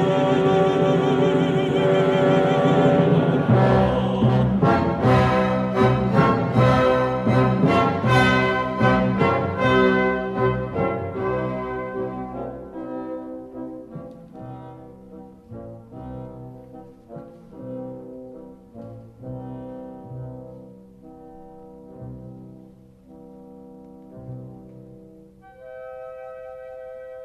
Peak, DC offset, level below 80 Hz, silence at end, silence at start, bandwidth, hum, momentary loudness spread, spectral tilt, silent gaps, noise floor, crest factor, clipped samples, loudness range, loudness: -4 dBFS; under 0.1%; -44 dBFS; 0 s; 0 s; 11 kHz; none; 23 LU; -8 dB/octave; none; -48 dBFS; 18 dB; under 0.1%; 22 LU; -19 LUFS